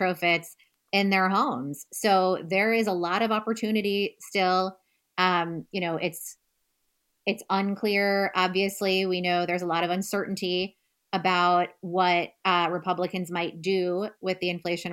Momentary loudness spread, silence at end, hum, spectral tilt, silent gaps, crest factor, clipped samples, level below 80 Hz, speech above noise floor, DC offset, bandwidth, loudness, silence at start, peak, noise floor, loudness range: 8 LU; 0 s; none; -4.5 dB/octave; none; 20 dB; under 0.1%; -74 dBFS; 49 dB; under 0.1%; 17 kHz; -26 LUFS; 0 s; -8 dBFS; -75 dBFS; 3 LU